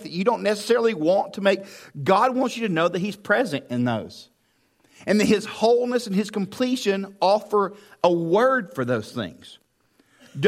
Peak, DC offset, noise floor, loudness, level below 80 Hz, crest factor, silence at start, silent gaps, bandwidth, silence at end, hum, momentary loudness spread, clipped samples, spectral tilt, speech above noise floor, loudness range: -2 dBFS; under 0.1%; -66 dBFS; -22 LUFS; -68 dBFS; 20 dB; 0 s; none; 15.5 kHz; 0 s; none; 9 LU; under 0.1%; -5.5 dB/octave; 43 dB; 2 LU